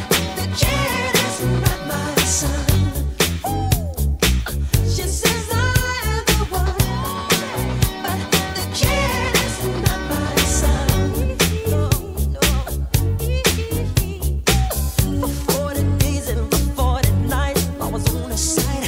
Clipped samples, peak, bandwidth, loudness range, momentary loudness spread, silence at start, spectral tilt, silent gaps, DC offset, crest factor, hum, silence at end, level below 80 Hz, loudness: under 0.1%; -4 dBFS; 16.5 kHz; 1 LU; 4 LU; 0 s; -4 dB/octave; none; under 0.1%; 16 dB; none; 0 s; -24 dBFS; -19 LUFS